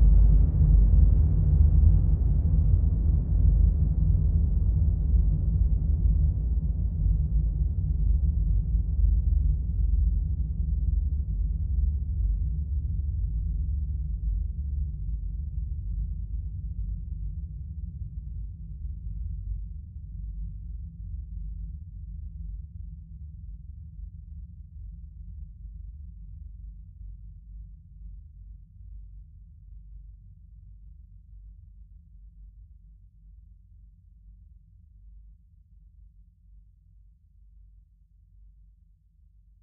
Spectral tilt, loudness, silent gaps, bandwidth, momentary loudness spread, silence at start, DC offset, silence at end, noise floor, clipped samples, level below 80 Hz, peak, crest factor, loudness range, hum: -15.5 dB/octave; -28 LUFS; none; 1.1 kHz; 23 LU; 0 s; under 0.1%; 4.4 s; -59 dBFS; under 0.1%; -28 dBFS; -8 dBFS; 18 dB; 23 LU; none